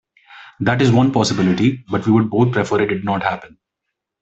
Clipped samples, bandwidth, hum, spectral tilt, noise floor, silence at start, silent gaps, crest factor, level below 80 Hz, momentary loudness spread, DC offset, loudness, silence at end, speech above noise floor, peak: under 0.1%; 8.2 kHz; none; -6.5 dB/octave; -79 dBFS; 0.3 s; none; 16 dB; -52 dBFS; 8 LU; under 0.1%; -17 LUFS; 0.75 s; 63 dB; -2 dBFS